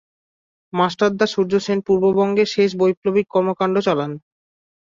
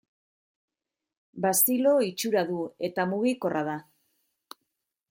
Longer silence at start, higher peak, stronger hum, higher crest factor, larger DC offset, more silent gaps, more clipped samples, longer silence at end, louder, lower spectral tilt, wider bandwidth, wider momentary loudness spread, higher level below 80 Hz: second, 0.75 s vs 1.35 s; first, -4 dBFS vs -8 dBFS; neither; second, 16 dB vs 22 dB; neither; first, 2.97-3.02 s vs none; neither; second, 0.75 s vs 1.3 s; first, -19 LUFS vs -26 LUFS; first, -6 dB/octave vs -4 dB/octave; second, 7.6 kHz vs 16.5 kHz; second, 5 LU vs 10 LU; first, -58 dBFS vs -76 dBFS